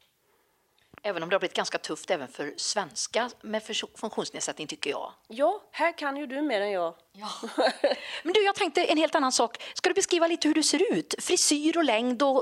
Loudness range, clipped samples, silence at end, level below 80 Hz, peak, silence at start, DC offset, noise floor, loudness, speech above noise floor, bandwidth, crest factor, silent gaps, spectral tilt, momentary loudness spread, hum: 7 LU; under 0.1%; 0 s; -76 dBFS; -8 dBFS; 1.05 s; under 0.1%; -69 dBFS; -27 LUFS; 41 dB; 14 kHz; 20 dB; none; -2 dB/octave; 10 LU; none